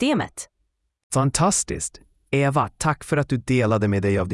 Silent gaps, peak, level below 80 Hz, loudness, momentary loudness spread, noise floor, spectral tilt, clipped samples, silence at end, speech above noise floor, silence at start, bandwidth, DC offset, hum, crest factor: 1.03-1.10 s; -6 dBFS; -46 dBFS; -22 LUFS; 11 LU; -72 dBFS; -5 dB/octave; under 0.1%; 0 s; 51 dB; 0 s; 12 kHz; under 0.1%; none; 18 dB